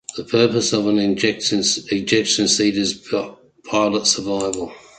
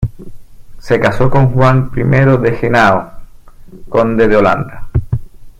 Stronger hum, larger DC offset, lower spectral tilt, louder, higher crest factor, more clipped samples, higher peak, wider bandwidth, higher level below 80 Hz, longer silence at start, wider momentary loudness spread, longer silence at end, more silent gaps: neither; neither; second, -3 dB/octave vs -8 dB/octave; second, -18 LUFS vs -12 LUFS; first, 18 dB vs 12 dB; neither; about the same, -2 dBFS vs 0 dBFS; about the same, 9.4 kHz vs 8.8 kHz; second, -54 dBFS vs -28 dBFS; about the same, 0.1 s vs 0 s; about the same, 8 LU vs 10 LU; about the same, 0.2 s vs 0.1 s; neither